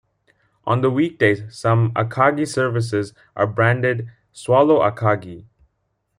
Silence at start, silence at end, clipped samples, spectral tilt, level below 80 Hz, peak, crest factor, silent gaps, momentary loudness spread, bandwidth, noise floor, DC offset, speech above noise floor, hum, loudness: 0.65 s; 0.75 s; under 0.1%; -7 dB/octave; -58 dBFS; -2 dBFS; 18 dB; none; 12 LU; 11.5 kHz; -71 dBFS; under 0.1%; 53 dB; none; -19 LUFS